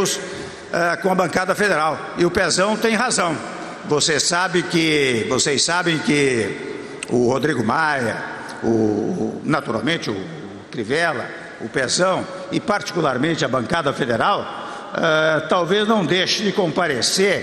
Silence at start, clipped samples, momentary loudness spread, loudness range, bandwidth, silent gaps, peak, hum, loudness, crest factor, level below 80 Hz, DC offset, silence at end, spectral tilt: 0 s; under 0.1%; 11 LU; 4 LU; 13.5 kHz; none; -6 dBFS; none; -19 LUFS; 14 dB; -54 dBFS; under 0.1%; 0 s; -3.5 dB/octave